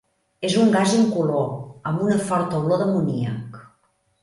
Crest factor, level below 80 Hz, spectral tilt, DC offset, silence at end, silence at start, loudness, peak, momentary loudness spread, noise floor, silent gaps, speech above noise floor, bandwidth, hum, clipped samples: 14 dB; -60 dBFS; -6 dB/octave; under 0.1%; 0.6 s; 0.4 s; -21 LUFS; -8 dBFS; 12 LU; -66 dBFS; none; 46 dB; 11.5 kHz; none; under 0.1%